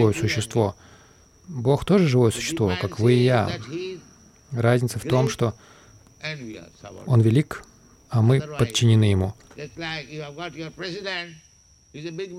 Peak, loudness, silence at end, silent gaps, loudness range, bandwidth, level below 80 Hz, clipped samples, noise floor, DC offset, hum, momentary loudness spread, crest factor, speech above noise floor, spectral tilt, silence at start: -6 dBFS; -23 LUFS; 0 s; none; 4 LU; 13.5 kHz; -52 dBFS; under 0.1%; -53 dBFS; under 0.1%; none; 18 LU; 16 dB; 31 dB; -6 dB/octave; 0 s